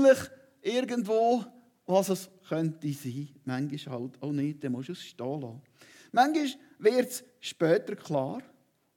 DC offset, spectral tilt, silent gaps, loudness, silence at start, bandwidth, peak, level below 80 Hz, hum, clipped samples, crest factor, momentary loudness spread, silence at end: under 0.1%; -5.5 dB/octave; none; -30 LUFS; 0 s; 18 kHz; -10 dBFS; -80 dBFS; none; under 0.1%; 20 dB; 13 LU; 0.55 s